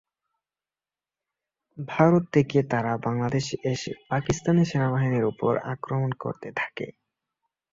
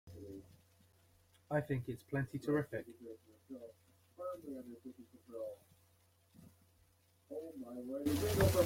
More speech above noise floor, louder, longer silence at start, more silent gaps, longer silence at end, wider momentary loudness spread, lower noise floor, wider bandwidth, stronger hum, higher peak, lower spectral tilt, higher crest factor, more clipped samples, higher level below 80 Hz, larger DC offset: first, over 65 dB vs 32 dB; first, -25 LUFS vs -41 LUFS; first, 1.75 s vs 0.05 s; neither; first, 0.85 s vs 0 s; second, 11 LU vs 19 LU; first, under -90 dBFS vs -72 dBFS; second, 7.8 kHz vs 16.5 kHz; neither; first, -6 dBFS vs -18 dBFS; about the same, -7 dB/octave vs -6 dB/octave; about the same, 20 dB vs 22 dB; neither; about the same, -58 dBFS vs -60 dBFS; neither